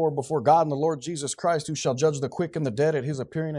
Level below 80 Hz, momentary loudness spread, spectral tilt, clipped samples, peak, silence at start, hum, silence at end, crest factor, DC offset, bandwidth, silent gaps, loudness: -64 dBFS; 9 LU; -5.5 dB/octave; under 0.1%; -8 dBFS; 0 s; none; 0 s; 18 dB; under 0.1%; 11.5 kHz; none; -25 LUFS